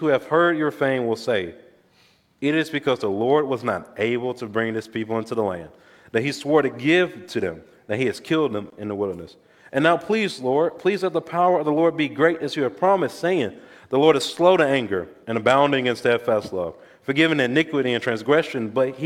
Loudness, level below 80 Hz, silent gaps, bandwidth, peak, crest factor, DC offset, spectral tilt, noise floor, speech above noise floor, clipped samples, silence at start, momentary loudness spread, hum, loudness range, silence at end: -22 LUFS; -64 dBFS; none; 15.5 kHz; -2 dBFS; 20 dB; under 0.1%; -5.5 dB/octave; -59 dBFS; 38 dB; under 0.1%; 0 s; 10 LU; none; 4 LU; 0 s